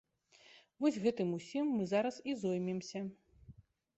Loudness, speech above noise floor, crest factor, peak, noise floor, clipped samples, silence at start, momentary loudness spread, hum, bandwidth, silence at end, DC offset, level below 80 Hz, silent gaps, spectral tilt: -37 LUFS; 29 dB; 18 dB; -20 dBFS; -65 dBFS; under 0.1%; 0.55 s; 9 LU; none; 8.2 kHz; 0.45 s; under 0.1%; -74 dBFS; none; -6.5 dB/octave